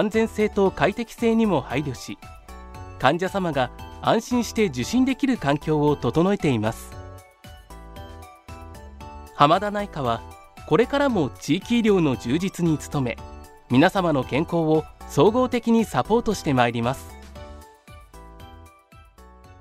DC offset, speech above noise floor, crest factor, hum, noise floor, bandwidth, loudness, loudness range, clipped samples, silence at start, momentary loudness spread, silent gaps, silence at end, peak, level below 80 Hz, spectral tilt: under 0.1%; 29 dB; 22 dB; none; -51 dBFS; 15.5 kHz; -22 LUFS; 5 LU; under 0.1%; 0 s; 22 LU; none; 0.95 s; -2 dBFS; -44 dBFS; -6 dB/octave